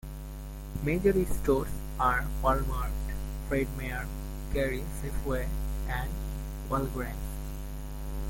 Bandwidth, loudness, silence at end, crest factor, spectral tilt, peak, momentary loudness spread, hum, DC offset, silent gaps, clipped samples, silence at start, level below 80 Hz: 17 kHz; -32 LUFS; 0 s; 18 dB; -6.5 dB/octave; -12 dBFS; 12 LU; none; under 0.1%; none; under 0.1%; 0.05 s; -36 dBFS